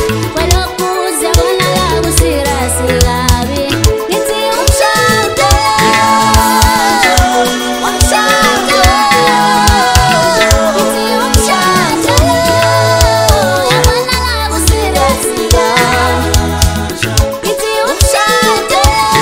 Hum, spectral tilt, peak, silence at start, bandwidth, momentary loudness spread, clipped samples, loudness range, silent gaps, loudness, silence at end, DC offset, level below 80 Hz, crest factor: none; -3.5 dB/octave; 0 dBFS; 0 s; over 20 kHz; 5 LU; 0.3%; 3 LU; none; -9 LUFS; 0 s; under 0.1%; -18 dBFS; 10 dB